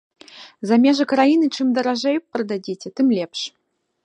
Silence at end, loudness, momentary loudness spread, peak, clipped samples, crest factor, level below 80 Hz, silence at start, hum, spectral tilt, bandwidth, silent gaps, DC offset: 0.55 s; -19 LUFS; 13 LU; -4 dBFS; under 0.1%; 16 dB; -74 dBFS; 0.35 s; none; -5 dB/octave; 9.6 kHz; none; under 0.1%